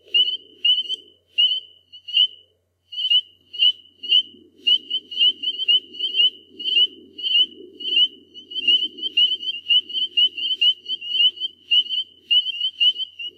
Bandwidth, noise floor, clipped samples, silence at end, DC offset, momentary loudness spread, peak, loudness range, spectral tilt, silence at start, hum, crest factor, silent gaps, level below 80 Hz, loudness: 8.4 kHz; -63 dBFS; under 0.1%; 0.1 s; under 0.1%; 9 LU; -6 dBFS; 2 LU; 0.5 dB/octave; 0.15 s; none; 16 dB; none; -82 dBFS; -18 LUFS